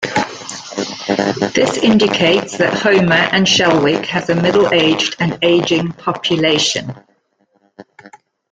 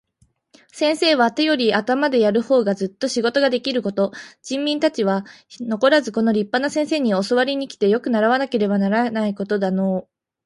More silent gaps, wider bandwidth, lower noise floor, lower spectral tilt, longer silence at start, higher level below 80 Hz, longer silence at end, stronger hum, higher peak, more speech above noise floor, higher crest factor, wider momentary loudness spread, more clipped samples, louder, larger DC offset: neither; second, 9.4 kHz vs 11.5 kHz; about the same, -60 dBFS vs -63 dBFS; about the same, -4 dB/octave vs -5 dB/octave; second, 0 s vs 0.75 s; first, -52 dBFS vs -66 dBFS; about the same, 0.45 s vs 0.45 s; neither; first, 0 dBFS vs -4 dBFS; first, 47 dB vs 43 dB; about the same, 14 dB vs 16 dB; first, 11 LU vs 7 LU; neither; first, -14 LUFS vs -19 LUFS; neither